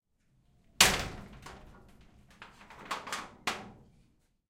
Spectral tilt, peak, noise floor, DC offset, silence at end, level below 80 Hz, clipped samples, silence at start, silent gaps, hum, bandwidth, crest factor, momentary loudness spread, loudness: -1 dB/octave; -4 dBFS; -70 dBFS; under 0.1%; 0.75 s; -54 dBFS; under 0.1%; 0.8 s; none; none; 16 kHz; 32 dB; 27 LU; -30 LUFS